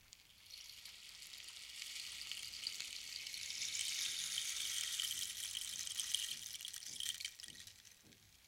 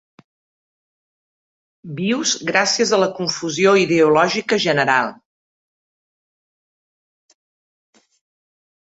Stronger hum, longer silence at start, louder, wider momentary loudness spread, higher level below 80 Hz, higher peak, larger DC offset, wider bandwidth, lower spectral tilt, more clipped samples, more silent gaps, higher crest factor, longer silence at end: neither; second, 0 s vs 1.85 s; second, -42 LUFS vs -17 LUFS; first, 15 LU vs 8 LU; second, -78 dBFS vs -64 dBFS; second, -18 dBFS vs -2 dBFS; neither; first, 17 kHz vs 8 kHz; second, 2.5 dB/octave vs -3.5 dB/octave; neither; neither; first, 28 dB vs 20 dB; second, 0 s vs 3.75 s